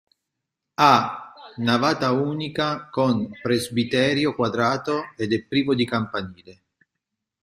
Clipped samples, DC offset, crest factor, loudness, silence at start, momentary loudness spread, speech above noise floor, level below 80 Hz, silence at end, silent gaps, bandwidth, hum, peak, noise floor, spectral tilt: under 0.1%; under 0.1%; 22 dB; -22 LUFS; 0.8 s; 11 LU; 61 dB; -60 dBFS; 0.9 s; none; 15 kHz; none; -2 dBFS; -83 dBFS; -5.5 dB/octave